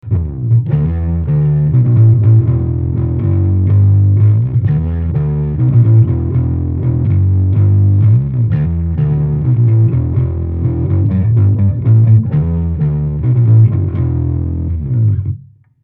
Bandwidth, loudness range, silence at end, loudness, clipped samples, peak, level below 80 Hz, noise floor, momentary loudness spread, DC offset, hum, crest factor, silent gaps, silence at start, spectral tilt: 2.5 kHz; 2 LU; 0.4 s; -13 LUFS; under 0.1%; 0 dBFS; -26 dBFS; -34 dBFS; 7 LU; under 0.1%; none; 10 dB; none; 0.05 s; -13.5 dB/octave